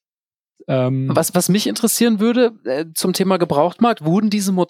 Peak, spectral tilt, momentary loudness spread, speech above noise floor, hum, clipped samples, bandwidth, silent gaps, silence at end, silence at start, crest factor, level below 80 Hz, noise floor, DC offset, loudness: -2 dBFS; -5 dB/octave; 5 LU; over 73 dB; none; under 0.1%; 17 kHz; none; 0.05 s; 0.7 s; 16 dB; -66 dBFS; under -90 dBFS; under 0.1%; -17 LUFS